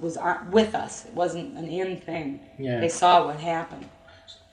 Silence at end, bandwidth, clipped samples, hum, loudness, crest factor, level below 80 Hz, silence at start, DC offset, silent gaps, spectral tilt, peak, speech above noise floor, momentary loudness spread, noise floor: 0.2 s; 10.5 kHz; under 0.1%; none; -25 LUFS; 20 dB; -60 dBFS; 0 s; under 0.1%; none; -4.5 dB/octave; -6 dBFS; 24 dB; 16 LU; -50 dBFS